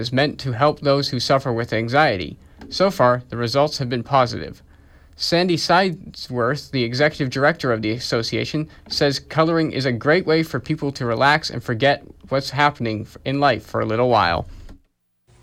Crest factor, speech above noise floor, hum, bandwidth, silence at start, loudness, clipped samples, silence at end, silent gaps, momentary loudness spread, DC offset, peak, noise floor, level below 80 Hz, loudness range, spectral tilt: 16 dB; 44 dB; none; 15.5 kHz; 0 s; -20 LUFS; under 0.1%; 0.65 s; none; 9 LU; under 0.1%; -4 dBFS; -63 dBFS; -48 dBFS; 2 LU; -5.5 dB/octave